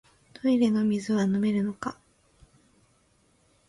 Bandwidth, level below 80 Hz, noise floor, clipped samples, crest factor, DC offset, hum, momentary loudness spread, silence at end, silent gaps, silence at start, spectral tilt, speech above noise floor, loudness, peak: 11.5 kHz; -66 dBFS; -65 dBFS; under 0.1%; 16 dB; under 0.1%; none; 10 LU; 1.75 s; none; 0.45 s; -7 dB/octave; 41 dB; -26 LUFS; -12 dBFS